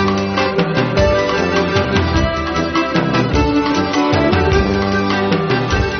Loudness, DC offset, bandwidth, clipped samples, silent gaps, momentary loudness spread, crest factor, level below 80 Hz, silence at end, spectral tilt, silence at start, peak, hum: -15 LUFS; 0.1%; 6.6 kHz; under 0.1%; none; 2 LU; 14 dB; -28 dBFS; 0 s; -4.5 dB/octave; 0 s; -2 dBFS; none